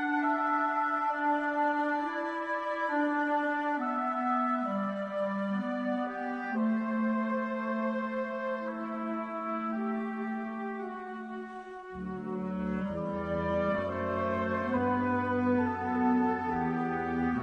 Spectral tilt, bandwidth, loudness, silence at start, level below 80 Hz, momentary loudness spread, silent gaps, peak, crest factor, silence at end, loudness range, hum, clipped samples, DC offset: -8 dB/octave; 6.8 kHz; -31 LUFS; 0 s; -60 dBFS; 8 LU; none; -18 dBFS; 14 dB; 0 s; 6 LU; none; under 0.1%; under 0.1%